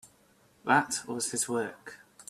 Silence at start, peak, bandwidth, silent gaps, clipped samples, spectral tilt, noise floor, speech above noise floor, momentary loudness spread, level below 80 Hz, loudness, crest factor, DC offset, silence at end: 0.05 s; -8 dBFS; 15 kHz; none; under 0.1%; -2.5 dB/octave; -64 dBFS; 34 dB; 18 LU; -74 dBFS; -30 LUFS; 24 dB; under 0.1%; 0.1 s